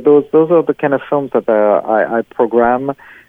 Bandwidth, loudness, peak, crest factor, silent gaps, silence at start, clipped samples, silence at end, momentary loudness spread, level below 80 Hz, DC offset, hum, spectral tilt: 3.7 kHz; -14 LUFS; 0 dBFS; 12 dB; none; 0 s; under 0.1%; 0.35 s; 6 LU; -52 dBFS; under 0.1%; none; -9.5 dB/octave